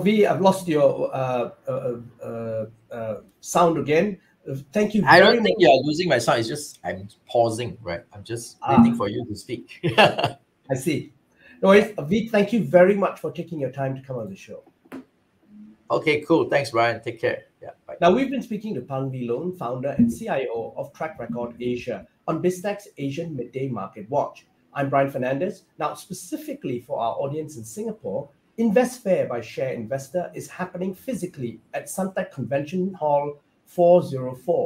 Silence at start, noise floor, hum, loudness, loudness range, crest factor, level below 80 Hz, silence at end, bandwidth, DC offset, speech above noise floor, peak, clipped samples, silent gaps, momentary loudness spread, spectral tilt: 0 s; -59 dBFS; none; -23 LUFS; 9 LU; 22 dB; -60 dBFS; 0 s; 16 kHz; under 0.1%; 37 dB; 0 dBFS; under 0.1%; none; 16 LU; -5.5 dB/octave